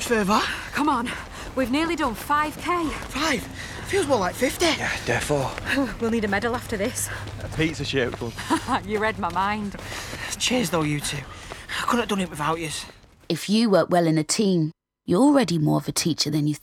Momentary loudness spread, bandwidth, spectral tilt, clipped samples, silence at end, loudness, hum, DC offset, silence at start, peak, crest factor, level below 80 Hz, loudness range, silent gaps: 11 LU; 17 kHz; -4.5 dB/octave; under 0.1%; 0.05 s; -24 LUFS; none; under 0.1%; 0 s; -6 dBFS; 16 dB; -44 dBFS; 4 LU; none